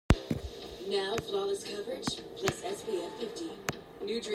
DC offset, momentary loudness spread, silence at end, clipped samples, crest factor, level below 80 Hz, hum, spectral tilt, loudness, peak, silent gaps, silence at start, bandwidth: under 0.1%; 7 LU; 0 s; under 0.1%; 26 dB; -44 dBFS; none; -5 dB/octave; -35 LUFS; -8 dBFS; none; 0.1 s; 16 kHz